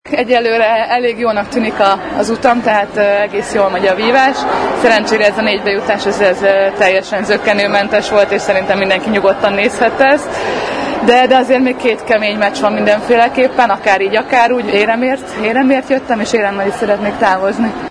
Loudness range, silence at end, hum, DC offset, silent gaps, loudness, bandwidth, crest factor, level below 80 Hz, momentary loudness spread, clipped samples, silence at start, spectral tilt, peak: 1 LU; 0 s; none; under 0.1%; none; -12 LUFS; 10.5 kHz; 12 dB; -46 dBFS; 5 LU; 0.2%; 0.05 s; -4.5 dB/octave; 0 dBFS